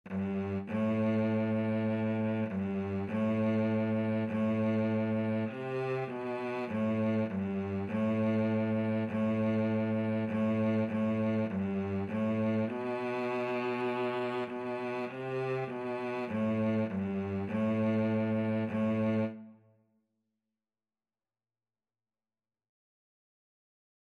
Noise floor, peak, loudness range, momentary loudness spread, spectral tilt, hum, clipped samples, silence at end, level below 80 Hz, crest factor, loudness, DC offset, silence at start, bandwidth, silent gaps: under -90 dBFS; -22 dBFS; 3 LU; 6 LU; -9 dB/octave; none; under 0.1%; 4.6 s; -74 dBFS; 12 dB; -32 LUFS; under 0.1%; 0.05 s; 6.2 kHz; none